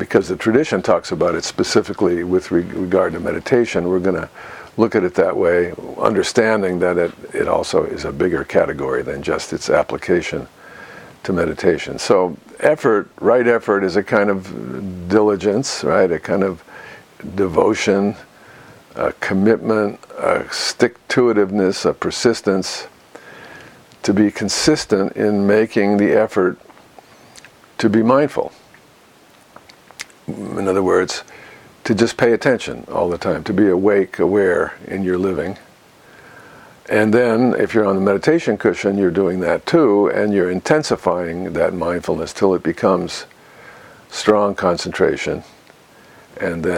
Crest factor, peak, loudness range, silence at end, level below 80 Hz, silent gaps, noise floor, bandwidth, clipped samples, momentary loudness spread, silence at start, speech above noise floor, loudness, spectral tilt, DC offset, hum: 18 dB; 0 dBFS; 4 LU; 0 s; -50 dBFS; none; -49 dBFS; 15.5 kHz; under 0.1%; 13 LU; 0 s; 32 dB; -17 LUFS; -5.5 dB/octave; under 0.1%; none